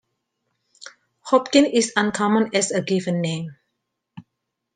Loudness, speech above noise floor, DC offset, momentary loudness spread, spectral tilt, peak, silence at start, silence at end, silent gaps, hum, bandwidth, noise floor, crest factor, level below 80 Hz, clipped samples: -20 LUFS; 60 dB; under 0.1%; 12 LU; -4.5 dB/octave; -2 dBFS; 0.85 s; 0.55 s; none; none; 10 kHz; -79 dBFS; 20 dB; -66 dBFS; under 0.1%